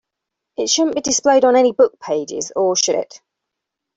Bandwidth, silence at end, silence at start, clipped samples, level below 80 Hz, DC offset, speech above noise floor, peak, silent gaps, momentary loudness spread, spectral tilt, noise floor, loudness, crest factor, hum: 8 kHz; 0.9 s; 0.6 s; under 0.1%; -62 dBFS; under 0.1%; 65 dB; -2 dBFS; none; 11 LU; -2 dB/octave; -81 dBFS; -16 LUFS; 16 dB; none